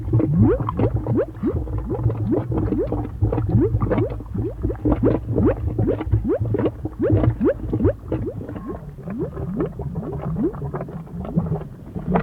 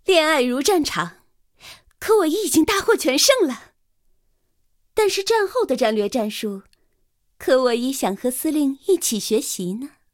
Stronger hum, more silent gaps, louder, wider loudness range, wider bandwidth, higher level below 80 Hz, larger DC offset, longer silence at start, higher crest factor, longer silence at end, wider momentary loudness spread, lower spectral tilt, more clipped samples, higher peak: neither; neither; second, -23 LUFS vs -20 LUFS; about the same, 6 LU vs 4 LU; second, 3.8 kHz vs 17 kHz; first, -32 dBFS vs -56 dBFS; neither; about the same, 0 s vs 0.1 s; about the same, 18 dB vs 20 dB; second, 0 s vs 0.25 s; second, 10 LU vs 13 LU; first, -11.5 dB/octave vs -2.5 dB/octave; neither; about the same, -4 dBFS vs -2 dBFS